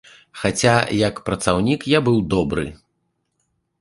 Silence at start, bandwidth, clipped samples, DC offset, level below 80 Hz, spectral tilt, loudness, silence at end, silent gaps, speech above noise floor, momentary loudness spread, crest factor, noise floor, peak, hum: 0.35 s; 11.5 kHz; under 0.1%; under 0.1%; -42 dBFS; -5 dB/octave; -19 LUFS; 1.05 s; none; 53 dB; 8 LU; 20 dB; -72 dBFS; 0 dBFS; none